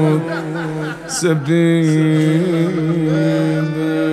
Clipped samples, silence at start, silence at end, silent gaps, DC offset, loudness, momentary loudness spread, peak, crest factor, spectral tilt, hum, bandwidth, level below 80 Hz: under 0.1%; 0 s; 0 s; none; under 0.1%; -16 LUFS; 8 LU; -4 dBFS; 12 dB; -6.5 dB/octave; none; 13 kHz; -54 dBFS